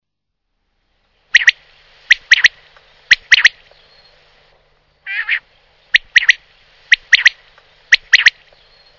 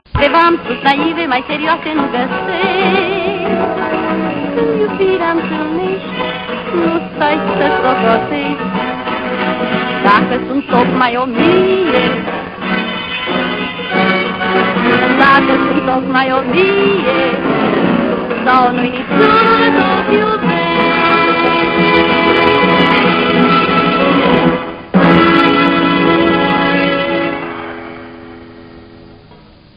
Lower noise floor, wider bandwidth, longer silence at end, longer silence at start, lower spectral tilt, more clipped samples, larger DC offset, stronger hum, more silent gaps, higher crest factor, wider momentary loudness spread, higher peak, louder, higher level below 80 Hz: first, -76 dBFS vs -40 dBFS; first, 6 kHz vs 5.4 kHz; about the same, 0.7 s vs 0.6 s; first, 1.35 s vs 0.15 s; second, 3 dB/octave vs -8 dB/octave; first, 0.7% vs under 0.1%; neither; neither; neither; about the same, 16 dB vs 12 dB; about the same, 10 LU vs 8 LU; about the same, 0 dBFS vs 0 dBFS; about the same, -11 LUFS vs -12 LUFS; second, -54 dBFS vs -42 dBFS